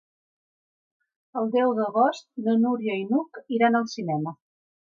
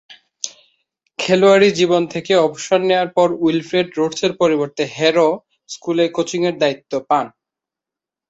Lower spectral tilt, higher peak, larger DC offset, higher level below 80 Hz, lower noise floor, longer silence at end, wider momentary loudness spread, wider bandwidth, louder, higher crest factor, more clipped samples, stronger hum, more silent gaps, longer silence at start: first, -6.5 dB/octave vs -4.5 dB/octave; second, -10 dBFS vs -2 dBFS; neither; second, -80 dBFS vs -62 dBFS; about the same, under -90 dBFS vs -87 dBFS; second, 0.6 s vs 1 s; second, 8 LU vs 16 LU; about the same, 7.4 kHz vs 8 kHz; second, -25 LUFS vs -17 LUFS; about the same, 16 dB vs 16 dB; neither; neither; neither; first, 1.35 s vs 0.1 s